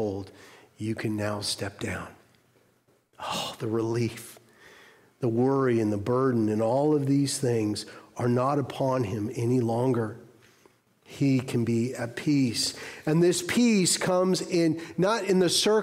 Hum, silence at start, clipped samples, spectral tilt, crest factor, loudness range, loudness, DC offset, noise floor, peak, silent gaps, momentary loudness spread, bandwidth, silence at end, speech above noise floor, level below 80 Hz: none; 0 s; under 0.1%; -5 dB/octave; 14 dB; 9 LU; -26 LUFS; under 0.1%; -66 dBFS; -12 dBFS; none; 11 LU; 16 kHz; 0 s; 40 dB; -66 dBFS